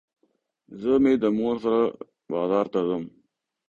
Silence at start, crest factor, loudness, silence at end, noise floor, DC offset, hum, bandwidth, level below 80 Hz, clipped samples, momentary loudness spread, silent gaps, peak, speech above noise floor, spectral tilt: 0.7 s; 16 dB; -24 LUFS; 0.6 s; -71 dBFS; under 0.1%; none; 7 kHz; -62 dBFS; under 0.1%; 12 LU; none; -8 dBFS; 48 dB; -8 dB/octave